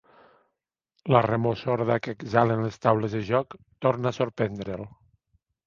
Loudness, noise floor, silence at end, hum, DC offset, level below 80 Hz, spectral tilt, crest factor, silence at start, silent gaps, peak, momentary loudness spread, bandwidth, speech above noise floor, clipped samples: -26 LUFS; -82 dBFS; 0.8 s; none; under 0.1%; -58 dBFS; -8 dB/octave; 24 dB; 1.05 s; none; -2 dBFS; 13 LU; 7.2 kHz; 57 dB; under 0.1%